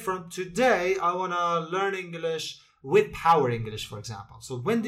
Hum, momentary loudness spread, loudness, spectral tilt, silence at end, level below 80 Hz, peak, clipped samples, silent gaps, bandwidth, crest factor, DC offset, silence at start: none; 15 LU; -26 LUFS; -5 dB/octave; 0 s; -56 dBFS; -10 dBFS; under 0.1%; none; 15.5 kHz; 18 dB; under 0.1%; 0 s